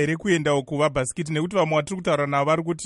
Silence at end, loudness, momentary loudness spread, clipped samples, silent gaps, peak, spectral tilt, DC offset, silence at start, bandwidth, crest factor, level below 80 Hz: 0 s; -23 LUFS; 4 LU; under 0.1%; none; -8 dBFS; -5.5 dB/octave; under 0.1%; 0 s; 11.5 kHz; 14 dB; -52 dBFS